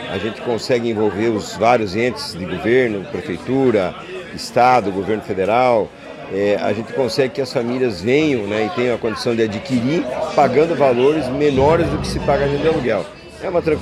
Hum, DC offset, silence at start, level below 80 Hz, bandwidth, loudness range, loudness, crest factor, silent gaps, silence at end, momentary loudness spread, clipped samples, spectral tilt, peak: none; under 0.1%; 0 s; -42 dBFS; 13.5 kHz; 3 LU; -18 LUFS; 16 dB; none; 0 s; 10 LU; under 0.1%; -6 dB/octave; 0 dBFS